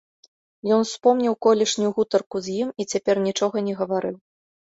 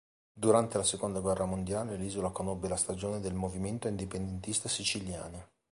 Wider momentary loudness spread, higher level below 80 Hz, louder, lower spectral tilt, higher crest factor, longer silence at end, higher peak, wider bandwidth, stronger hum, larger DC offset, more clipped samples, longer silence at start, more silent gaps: about the same, 8 LU vs 10 LU; second, -66 dBFS vs -52 dBFS; first, -22 LUFS vs -33 LUFS; about the same, -4.5 dB/octave vs -4 dB/octave; about the same, 18 dB vs 22 dB; first, 0.55 s vs 0.25 s; first, -4 dBFS vs -12 dBFS; second, 8 kHz vs 11.5 kHz; neither; neither; neither; first, 0.65 s vs 0.35 s; first, 2.26-2.30 s vs none